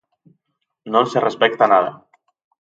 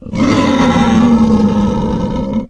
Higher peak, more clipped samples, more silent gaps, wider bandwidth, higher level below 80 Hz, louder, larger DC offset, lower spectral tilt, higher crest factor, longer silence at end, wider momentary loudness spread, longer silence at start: about the same, 0 dBFS vs 0 dBFS; neither; neither; second, 7.8 kHz vs 9.2 kHz; second, -70 dBFS vs -28 dBFS; second, -17 LUFS vs -12 LUFS; neither; second, -5 dB/octave vs -6.5 dB/octave; first, 20 dB vs 12 dB; first, 0.7 s vs 0 s; about the same, 6 LU vs 7 LU; first, 0.85 s vs 0 s